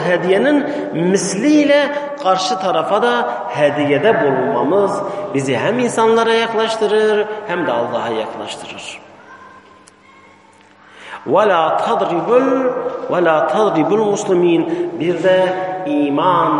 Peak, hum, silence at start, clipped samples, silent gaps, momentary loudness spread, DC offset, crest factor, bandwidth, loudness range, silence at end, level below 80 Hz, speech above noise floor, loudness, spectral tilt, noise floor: 0 dBFS; none; 0 s; under 0.1%; none; 8 LU; under 0.1%; 14 dB; 11.5 kHz; 8 LU; 0 s; -64 dBFS; 31 dB; -15 LUFS; -5 dB/octave; -46 dBFS